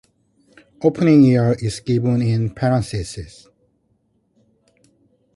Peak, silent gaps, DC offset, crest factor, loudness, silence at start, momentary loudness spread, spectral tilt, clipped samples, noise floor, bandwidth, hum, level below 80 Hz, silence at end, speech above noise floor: -2 dBFS; none; under 0.1%; 18 dB; -17 LUFS; 0.8 s; 16 LU; -7.5 dB/octave; under 0.1%; -64 dBFS; 11.5 kHz; none; -46 dBFS; 2.1 s; 48 dB